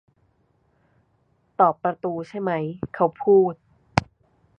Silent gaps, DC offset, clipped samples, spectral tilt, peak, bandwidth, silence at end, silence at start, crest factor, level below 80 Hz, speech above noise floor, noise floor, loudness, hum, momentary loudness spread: none; under 0.1%; under 0.1%; -7 dB/octave; 0 dBFS; 8.4 kHz; 0.55 s; 1.6 s; 24 dB; -52 dBFS; 44 dB; -66 dBFS; -23 LUFS; none; 12 LU